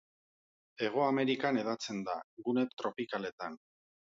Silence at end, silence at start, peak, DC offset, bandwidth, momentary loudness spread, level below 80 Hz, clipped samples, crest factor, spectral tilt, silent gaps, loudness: 0.6 s; 0.8 s; -16 dBFS; under 0.1%; 7.8 kHz; 11 LU; -82 dBFS; under 0.1%; 20 dB; -5 dB/octave; 2.24-2.37 s, 3.32-3.38 s; -35 LUFS